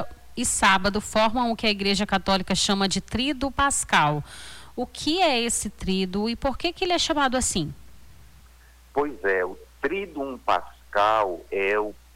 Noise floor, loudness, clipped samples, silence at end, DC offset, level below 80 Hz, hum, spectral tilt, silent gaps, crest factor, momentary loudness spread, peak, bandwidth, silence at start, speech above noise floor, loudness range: -51 dBFS; -24 LUFS; under 0.1%; 0.2 s; under 0.1%; -44 dBFS; none; -3 dB/octave; none; 16 dB; 10 LU; -10 dBFS; 17 kHz; 0 s; 27 dB; 5 LU